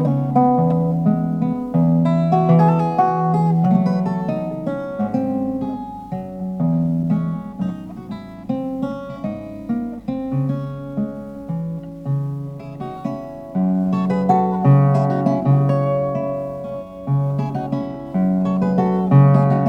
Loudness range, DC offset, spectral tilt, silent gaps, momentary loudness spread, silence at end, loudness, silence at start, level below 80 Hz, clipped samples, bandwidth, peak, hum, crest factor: 9 LU; under 0.1%; -10.5 dB/octave; none; 14 LU; 0 s; -19 LUFS; 0 s; -50 dBFS; under 0.1%; 5.6 kHz; -2 dBFS; none; 18 dB